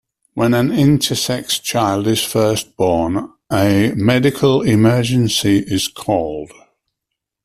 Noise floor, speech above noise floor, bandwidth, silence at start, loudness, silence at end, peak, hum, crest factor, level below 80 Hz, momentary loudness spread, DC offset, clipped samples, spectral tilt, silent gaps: -80 dBFS; 64 dB; 15.5 kHz; 0.35 s; -16 LUFS; 1 s; -2 dBFS; none; 14 dB; -46 dBFS; 7 LU; under 0.1%; under 0.1%; -5 dB/octave; none